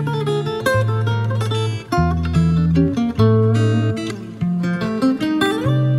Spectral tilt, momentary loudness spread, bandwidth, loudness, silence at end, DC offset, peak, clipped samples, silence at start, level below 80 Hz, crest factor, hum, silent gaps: -7.5 dB/octave; 6 LU; 13.5 kHz; -18 LUFS; 0 s; under 0.1%; -2 dBFS; under 0.1%; 0 s; -36 dBFS; 14 dB; none; none